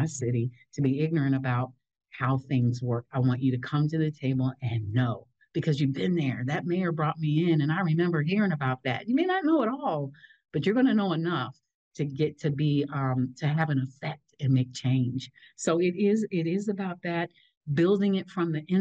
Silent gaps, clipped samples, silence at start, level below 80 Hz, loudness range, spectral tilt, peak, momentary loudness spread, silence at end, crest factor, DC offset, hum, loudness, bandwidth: 11.74-11.91 s, 17.57-17.61 s; under 0.1%; 0 s; -70 dBFS; 2 LU; -7 dB/octave; -14 dBFS; 8 LU; 0 s; 12 dB; under 0.1%; none; -28 LUFS; 8.8 kHz